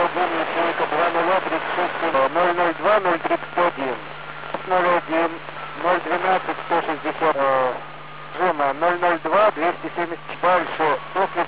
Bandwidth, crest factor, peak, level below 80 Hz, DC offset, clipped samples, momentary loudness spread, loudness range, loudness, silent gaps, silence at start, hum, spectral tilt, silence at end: 4 kHz; 14 dB; -8 dBFS; -60 dBFS; 0.9%; under 0.1%; 9 LU; 2 LU; -21 LUFS; none; 0 s; none; -8 dB/octave; 0 s